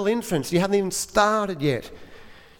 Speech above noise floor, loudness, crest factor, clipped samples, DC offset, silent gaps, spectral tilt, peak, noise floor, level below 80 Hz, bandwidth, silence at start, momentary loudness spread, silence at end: 22 dB; -23 LUFS; 18 dB; under 0.1%; under 0.1%; none; -4.5 dB/octave; -4 dBFS; -45 dBFS; -50 dBFS; 19 kHz; 0 s; 7 LU; 0.25 s